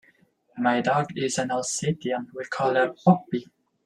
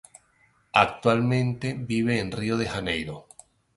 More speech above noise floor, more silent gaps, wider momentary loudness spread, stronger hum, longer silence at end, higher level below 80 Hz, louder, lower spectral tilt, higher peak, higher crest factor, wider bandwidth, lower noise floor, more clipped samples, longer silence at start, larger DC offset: about the same, 38 dB vs 39 dB; neither; about the same, 11 LU vs 9 LU; neither; second, 0.4 s vs 0.55 s; second, -66 dBFS vs -52 dBFS; about the same, -25 LUFS vs -25 LUFS; about the same, -5 dB/octave vs -6 dB/octave; second, -4 dBFS vs 0 dBFS; about the same, 22 dB vs 26 dB; about the same, 12 kHz vs 11.5 kHz; about the same, -62 dBFS vs -64 dBFS; neither; second, 0.55 s vs 0.75 s; neither